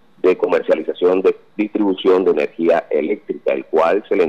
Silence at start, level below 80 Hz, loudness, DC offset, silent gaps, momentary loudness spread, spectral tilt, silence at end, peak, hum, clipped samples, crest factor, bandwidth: 0.25 s; -68 dBFS; -17 LUFS; 0.3%; none; 6 LU; -7 dB/octave; 0 s; -4 dBFS; none; under 0.1%; 12 dB; 7.2 kHz